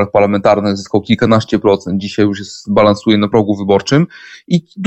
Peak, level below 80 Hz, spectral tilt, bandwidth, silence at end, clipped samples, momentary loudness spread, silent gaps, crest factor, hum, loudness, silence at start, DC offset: 0 dBFS; -46 dBFS; -6.5 dB/octave; 8.4 kHz; 0 s; under 0.1%; 6 LU; none; 12 dB; none; -13 LUFS; 0 s; under 0.1%